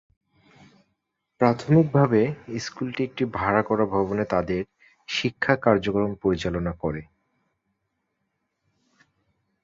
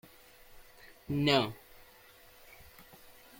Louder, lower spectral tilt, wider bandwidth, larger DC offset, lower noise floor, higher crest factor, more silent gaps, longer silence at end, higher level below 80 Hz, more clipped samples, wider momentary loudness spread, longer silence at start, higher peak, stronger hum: first, -24 LUFS vs -30 LUFS; first, -7 dB/octave vs -5.5 dB/octave; second, 7.6 kHz vs 17 kHz; neither; first, -77 dBFS vs -58 dBFS; about the same, 22 dB vs 24 dB; neither; first, 2.6 s vs 0.3 s; first, -50 dBFS vs -62 dBFS; neither; second, 11 LU vs 28 LU; first, 1.4 s vs 0.55 s; first, -4 dBFS vs -14 dBFS; neither